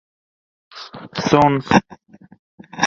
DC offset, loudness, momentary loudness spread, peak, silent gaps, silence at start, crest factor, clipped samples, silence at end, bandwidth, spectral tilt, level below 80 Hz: under 0.1%; -16 LUFS; 22 LU; 0 dBFS; 2.39-2.58 s; 0.75 s; 20 dB; under 0.1%; 0 s; 7.6 kHz; -5 dB/octave; -50 dBFS